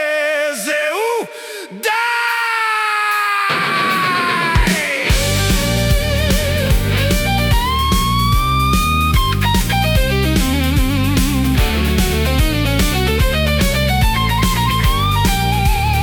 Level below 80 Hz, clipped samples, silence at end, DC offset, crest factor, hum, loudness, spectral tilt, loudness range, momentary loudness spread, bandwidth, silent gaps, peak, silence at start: -20 dBFS; under 0.1%; 0 s; under 0.1%; 12 dB; none; -15 LUFS; -4.5 dB/octave; 1 LU; 2 LU; 19 kHz; none; -2 dBFS; 0 s